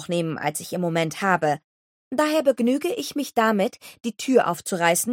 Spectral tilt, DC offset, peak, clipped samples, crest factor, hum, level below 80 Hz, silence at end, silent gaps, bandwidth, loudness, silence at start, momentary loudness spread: -4.5 dB/octave; under 0.1%; -4 dBFS; under 0.1%; 20 dB; none; -70 dBFS; 0 s; 1.64-2.11 s; 17 kHz; -23 LUFS; 0 s; 8 LU